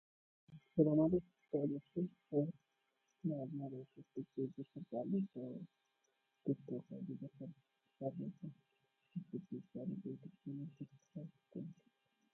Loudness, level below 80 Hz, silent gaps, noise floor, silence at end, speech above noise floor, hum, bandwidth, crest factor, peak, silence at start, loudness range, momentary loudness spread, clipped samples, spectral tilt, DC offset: -43 LUFS; -78 dBFS; none; -84 dBFS; 0.6 s; 42 dB; none; 6.2 kHz; 24 dB; -20 dBFS; 0.5 s; 11 LU; 17 LU; under 0.1%; -12 dB/octave; under 0.1%